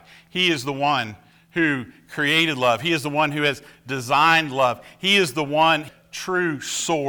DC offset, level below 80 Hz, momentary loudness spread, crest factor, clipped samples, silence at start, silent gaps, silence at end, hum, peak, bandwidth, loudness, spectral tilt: under 0.1%; -62 dBFS; 13 LU; 16 dB; under 0.1%; 0.35 s; none; 0 s; none; -6 dBFS; over 20 kHz; -20 LUFS; -3.5 dB/octave